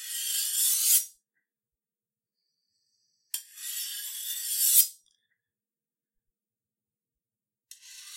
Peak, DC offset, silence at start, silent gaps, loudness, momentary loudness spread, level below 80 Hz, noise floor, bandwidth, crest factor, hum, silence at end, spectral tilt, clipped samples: -6 dBFS; under 0.1%; 0 s; none; -24 LUFS; 17 LU; under -90 dBFS; under -90 dBFS; 16 kHz; 28 dB; none; 0 s; 10 dB/octave; under 0.1%